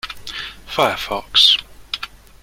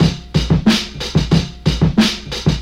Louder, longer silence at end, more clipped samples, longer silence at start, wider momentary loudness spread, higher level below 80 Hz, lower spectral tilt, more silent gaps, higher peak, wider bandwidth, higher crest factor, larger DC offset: about the same, -15 LUFS vs -16 LUFS; first, 0.35 s vs 0 s; neither; about the same, 0.05 s vs 0 s; first, 18 LU vs 5 LU; second, -46 dBFS vs -26 dBFS; second, -1.5 dB/octave vs -5.5 dB/octave; neither; about the same, 0 dBFS vs 0 dBFS; about the same, 16.5 kHz vs 15 kHz; first, 20 dB vs 14 dB; neither